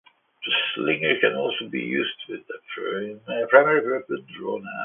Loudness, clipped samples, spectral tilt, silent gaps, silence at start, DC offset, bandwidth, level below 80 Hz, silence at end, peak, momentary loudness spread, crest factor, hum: -23 LUFS; under 0.1%; -8.5 dB/octave; none; 0.4 s; under 0.1%; 3.9 kHz; -72 dBFS; 0 s; -2 dBFS; 17 LU; 22 dB; none